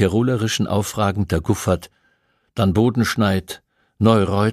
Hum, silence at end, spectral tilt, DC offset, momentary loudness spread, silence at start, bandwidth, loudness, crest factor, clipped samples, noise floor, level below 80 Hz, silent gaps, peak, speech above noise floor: none; 0 s; -6 dB/octave; under 0.1%; 8 LU; 0 s; 15 kHz; -19 LUFS; 18 dB; under 0.1%; -64 dBFS; -42 dBFS; none; -2 dBFS; 46 dB